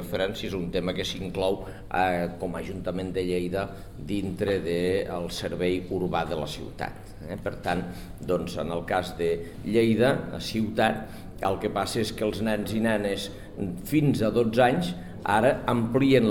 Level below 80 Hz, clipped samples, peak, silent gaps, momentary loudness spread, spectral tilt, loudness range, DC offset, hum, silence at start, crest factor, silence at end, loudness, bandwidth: -46 dBFS; under 0.1%; -8 dBFS; none; 12 LU; -6 dB/octave; 5 LU; 0.4%; none; 0 s; 18 dB; 0 s; -27 LUFS; 17 kHz